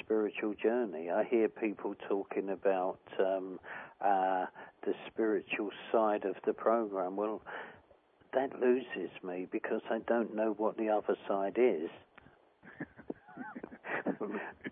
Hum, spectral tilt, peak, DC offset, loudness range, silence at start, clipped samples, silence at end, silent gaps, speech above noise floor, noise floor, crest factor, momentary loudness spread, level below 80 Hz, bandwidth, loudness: none; -4 dB/octave; -16 dBFS; under 0.1%; 2 LU; 0.1 s; under 0.1%; 0 s; none; 32 dB; -65 dBFS; 18 dB; 14 LU; -80 dBFS; 3.8 kHz; -34 LUFS